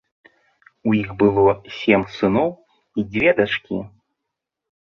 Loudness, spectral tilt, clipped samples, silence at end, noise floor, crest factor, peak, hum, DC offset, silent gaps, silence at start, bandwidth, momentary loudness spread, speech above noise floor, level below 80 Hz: -20 LUFS; -7.5 dB/octave; under 0.1%; 1 s; -81 dBFS; 20 dB; -2 dBFS; none; under 0.1%; none; 0.85 s; 6.6 kHz; 13 LU; 63 dB; -50 dBFS